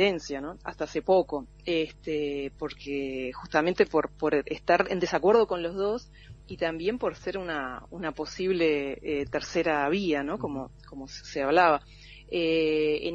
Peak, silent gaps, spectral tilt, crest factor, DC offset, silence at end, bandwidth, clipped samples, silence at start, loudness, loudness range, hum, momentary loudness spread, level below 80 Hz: -8 dBFS; none; -5.5 dB/octave; 20 dB; under 0.1%; 0 s; 8 kHz; under 0.1%; 0 s; -28 LUFS; 4 LU; none; 12 LU; -52 dBFS